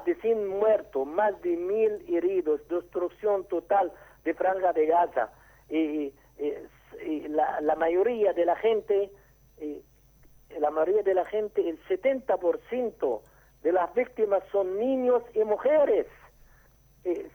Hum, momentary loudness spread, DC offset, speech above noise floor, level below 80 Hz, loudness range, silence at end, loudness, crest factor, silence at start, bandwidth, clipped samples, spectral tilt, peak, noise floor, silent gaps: none; 11 LU; under 0.1%; 33 dB; -62 dBFS; 2 LU; 0.05 s; -27 LUFS; 16 dB; 0 s; over 20 kHz; under 0.1%; -6.5 dB/octave; -12 dBFS; -59 dBFS; none